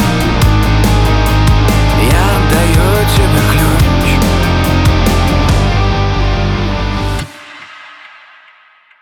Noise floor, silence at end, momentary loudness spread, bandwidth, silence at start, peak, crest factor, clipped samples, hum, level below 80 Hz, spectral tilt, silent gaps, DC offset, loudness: -45 dBFS; 0.95 s; 8 LU; 19 kHz; 0 s; 0 dBFS; 10 dB; under 0.1%; none; -16 dBFS; -5.5 dB/octave; none; under 0.1%; -11 LUFS